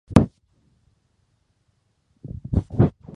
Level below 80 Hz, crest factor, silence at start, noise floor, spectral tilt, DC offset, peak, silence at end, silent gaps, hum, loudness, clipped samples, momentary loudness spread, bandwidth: -36 dBFS; 24 dB; 0.1 s; -68 dBFS; -8.5 dB/octave; under 0.1%; 0 dBFS; 0.25 s; none; none; -22 LUFS; under 0.1%; 20 LU; 11.5 kHz